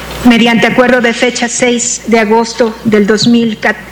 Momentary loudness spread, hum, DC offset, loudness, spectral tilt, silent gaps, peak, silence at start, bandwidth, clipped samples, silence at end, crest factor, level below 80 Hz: 5 LU; none; under 0.1%; -9 LUFS; -3.5 dB/octave; none; 0 dBFS; 0 s; 19 kHz; 1%; 0 s; 10 dB; -38 dBFS